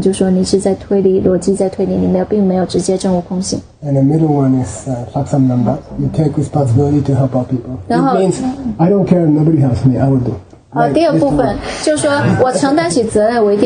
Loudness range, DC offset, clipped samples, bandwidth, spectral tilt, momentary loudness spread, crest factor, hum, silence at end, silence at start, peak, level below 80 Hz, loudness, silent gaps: 2 LU; under 0.1%; under 0.1%; 10 kHz; -7 dB/octave; 7 LU; 12 dB; none; 0 s; 0 s; 0 dBFS; -36 dBFS; -13 LUFS; none